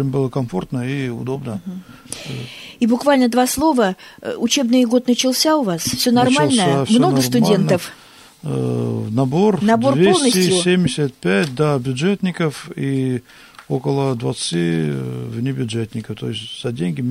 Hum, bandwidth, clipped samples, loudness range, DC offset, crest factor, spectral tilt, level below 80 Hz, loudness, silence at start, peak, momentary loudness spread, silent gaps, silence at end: none; 16 kHz; under 0.1%; 6 LU; under 0.1%; 14 dB; -5 dB/octave; -52 dBFS; -18 LUFS; 0 s; -4 dBFS; 13 LU; none; 0 s